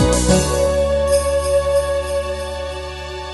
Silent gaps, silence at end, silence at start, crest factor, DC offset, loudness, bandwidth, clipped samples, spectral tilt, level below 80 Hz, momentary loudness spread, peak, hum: none; 0 s; 0 s; 16 dB; under 0.1%; -18 LUFS; 12 kHz; under 0.1%; -4.5 dB/octave; -26 dBFS; 12 LU; -2 dBFS; none